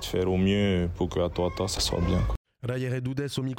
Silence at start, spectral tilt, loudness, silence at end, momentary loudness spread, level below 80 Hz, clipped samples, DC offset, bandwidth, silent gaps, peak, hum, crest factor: 0 s; -5.5 dB/octave; -28 LUFS; 0 s; 7 LU; -38 dBFS; under 0.1%; under 0.1%; 16.5 kHz; 2.37-2.45 s; -16 dBFS; none; 12 dB